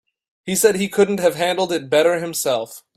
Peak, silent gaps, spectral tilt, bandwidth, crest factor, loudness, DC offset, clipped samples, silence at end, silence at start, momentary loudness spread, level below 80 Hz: -2 dBFS; none; -3.5 dB/octave; 16 kHz; 16 dB; -18 LUFS; under 0.1%; under 0.1%; 0.15 s; 0.45 s; 6 LU; -62 dBFS